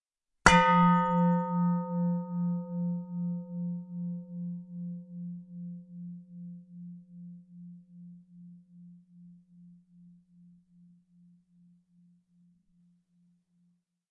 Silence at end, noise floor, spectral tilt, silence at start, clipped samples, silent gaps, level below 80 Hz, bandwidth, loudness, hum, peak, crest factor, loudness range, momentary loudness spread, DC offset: 4.4 s; -72 dBFS; -6 dB/octave; 0.45 s; under 0.1%; none; -54 dBFS; 11 kHz; -29 LUFS; none; -2 dBFS; 32 dB; 27 LU; 27 LU; under 0.1%